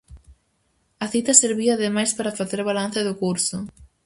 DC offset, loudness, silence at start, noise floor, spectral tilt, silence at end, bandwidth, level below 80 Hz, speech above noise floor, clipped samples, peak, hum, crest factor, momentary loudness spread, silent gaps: under 0.1%; -20 LUFS; 0.1 s; -68 dBFS; -3 dB/octave; 0.2 s; 11.5 kHz; -54 dBFS; 46 dB; under 0.1%; 0 dBFS; none; 24 dB; 12 LU; none